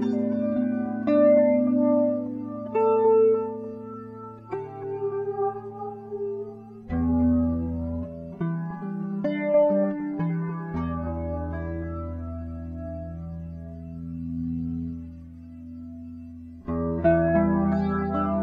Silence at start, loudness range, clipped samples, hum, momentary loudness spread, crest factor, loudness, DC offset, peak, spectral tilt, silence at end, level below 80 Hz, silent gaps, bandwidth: 0 s; 12 LU; under 0.1%; none; 18 LU; 16 dB; -26 LUFS; under 0.1%; -10 dBFS; -11 dB/octave; 0 s; -44 dBFS; none; 4.9 kHz